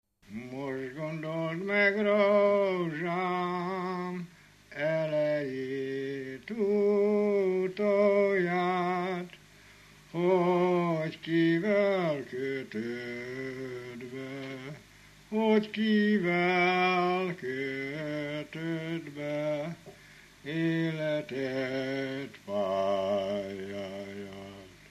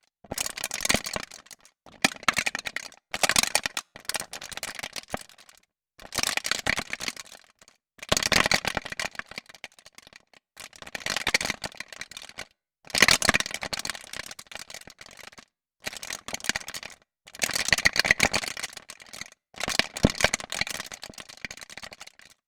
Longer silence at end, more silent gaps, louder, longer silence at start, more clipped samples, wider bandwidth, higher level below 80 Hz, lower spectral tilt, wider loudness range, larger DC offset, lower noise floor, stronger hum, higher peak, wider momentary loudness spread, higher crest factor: second, 0.15 s vs 0.45 s; neither; second, -30 LUFS vs -26 LUFS; about the same, 0.3 s vs 0.3 s; neither; second, 13.5 kHz vs over 20 kHz; second, -70 dBFS vs -50 dBFS; first, -7 dB/octave vs -1.5 dB/octave; about the same, 6 LU vs 7 LU; neither; second, -56 dBFS vs -60 dBFS; first, 50 Hz at -65 dBFS vs none; second, -14 dBFS vs 0 dBFS; second, 15 LU vs 22 LU; second, 16 dB vs 30 dB